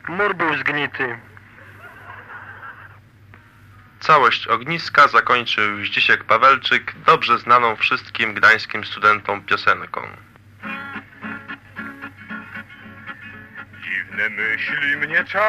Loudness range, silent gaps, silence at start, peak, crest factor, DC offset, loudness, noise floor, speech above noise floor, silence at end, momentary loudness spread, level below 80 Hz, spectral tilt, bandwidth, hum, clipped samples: 17 LU; none; 0.05 s; -2 dBFS; 18 dB; under 0.1%; -17 LUFS; -47 dBFS; 29 dB; 0 s; 23 LU; -60 dBFS; -4 dB/octave; 14.5 kHz; none; under 0.1%